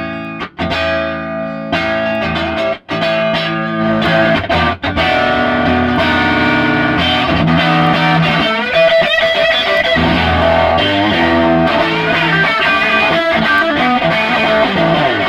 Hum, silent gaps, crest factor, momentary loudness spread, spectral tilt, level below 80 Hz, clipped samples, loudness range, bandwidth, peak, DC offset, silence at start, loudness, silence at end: none; none; 12 dB; 6 LU; -6 dB/octave; -34 dBFS; under 0.1%; 4 LU; 13 kHz; 0 dBFS; under 0.1%; 0 s; -12 LUFS; 0 s